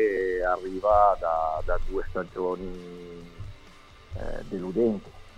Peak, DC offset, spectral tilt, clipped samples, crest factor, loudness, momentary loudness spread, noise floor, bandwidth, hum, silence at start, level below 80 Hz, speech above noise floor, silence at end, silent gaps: -8 dBFS; under 0.1%; -7.5 dB/octave; under 0.1%; 20 dB; -27 LUFS; 21 LU; -50 dBFS; 9 kHz; none; 0 s; -38 dBFS; 24 dB; 0 s; none